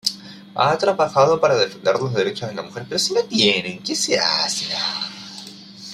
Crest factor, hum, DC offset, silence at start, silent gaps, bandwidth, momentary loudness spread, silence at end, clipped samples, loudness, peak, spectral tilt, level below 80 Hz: 20 dB; none; under 0.1%; 0.05 s; none; 15.5 kHz; 17 LU; 0 s; under 0.1%; -19 LUFS; 0 dBFS; -3 dB/octave; -62 dBFS